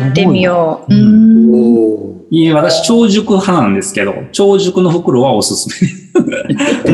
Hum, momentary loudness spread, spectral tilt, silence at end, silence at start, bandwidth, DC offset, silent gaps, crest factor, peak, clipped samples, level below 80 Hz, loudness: none; 9 LU; -5.5 dB/octave; 0 s; 0 s; 12.5 kHz; under 0.1%; none; 10 dB; 0 dBFS; under 0.1%; -48 dBFS; -10 LUFS